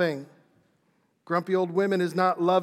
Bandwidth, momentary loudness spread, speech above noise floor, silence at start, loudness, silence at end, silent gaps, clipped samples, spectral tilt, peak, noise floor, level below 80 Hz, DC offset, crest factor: 14.5 kHz; 6 LU; 45 dB; 0 s; -26 LUFS; 0 s; none; under 0.1%; -7 dB/octave; -10 dBFS; -69 dBFS; -90 dBFS; under 0.1%; 16 dB